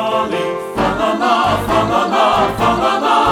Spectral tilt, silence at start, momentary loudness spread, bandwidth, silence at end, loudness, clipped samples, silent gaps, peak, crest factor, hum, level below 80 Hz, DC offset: -5 dB/octave; 0 s; 5 LU; 18 kHz; 0 s; -15 LUFS; under 0.1%; none; -2 dBFS; 12 dB; none; -38 dBFS; under 0.1%